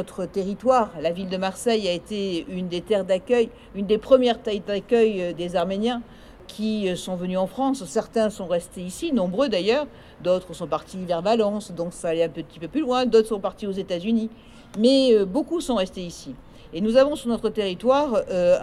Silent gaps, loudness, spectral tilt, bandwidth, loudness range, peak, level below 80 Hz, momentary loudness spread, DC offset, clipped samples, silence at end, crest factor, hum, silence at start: none; -23 LUFS; -5.5 dB/octave; 13.5 kHz; 3 LU; -4 dBFS; -52 dBFS; 11 LU; under 0.1%; under 0.1%; 0 s; 18 dB; none; 0 s